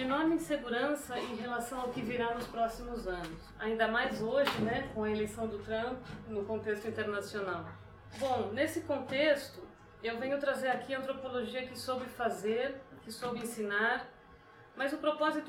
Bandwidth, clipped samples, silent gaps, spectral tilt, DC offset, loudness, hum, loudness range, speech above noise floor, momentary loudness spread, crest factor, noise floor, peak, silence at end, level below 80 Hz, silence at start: 16.5 kHz; under 0.1%; none; -4.5 dB/octave; under 0.1%; -35 LUFS; none; 3 LU; 22 dB; 11 LU; 20 dB; -57 dBFS; -16 dBFS; 0 s; -60 dBFS; 0 s